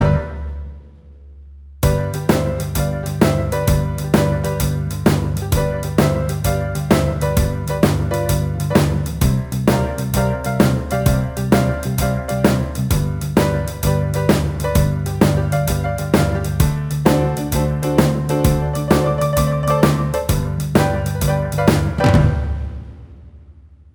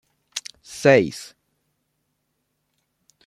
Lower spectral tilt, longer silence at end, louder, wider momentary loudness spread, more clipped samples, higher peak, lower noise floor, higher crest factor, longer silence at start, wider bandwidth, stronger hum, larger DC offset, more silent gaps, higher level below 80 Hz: first, -6.5 dB/octave vs -5 dB/octave; second, 0.4 s vs 2 s; about the same, -18 LUFS vs -18 LUFS; second, 4 LU vs 21 LU; neither; about the same, 0 dBFS vs -2 dBFS; second, -43 dBFS vs -74 dBFS; second, 18 dB vs 24 dB; second, 0 s vs 0.35 s; first, over 20 kHz vs 13.5 kHz; second, none vs 50 Hz at -60 dBFS; neither; neither; first, -26 dBFS vs -64 dBFS